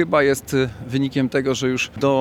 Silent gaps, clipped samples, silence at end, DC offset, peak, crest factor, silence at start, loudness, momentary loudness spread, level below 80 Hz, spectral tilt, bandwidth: none; under 0.1%; 0 s; under 0.1%; -4 dBFS; 16 dB; 0 s; -21 LUFS; 5 LU; -50 dBFS; -5.5 dB/octave; 16.5 kHz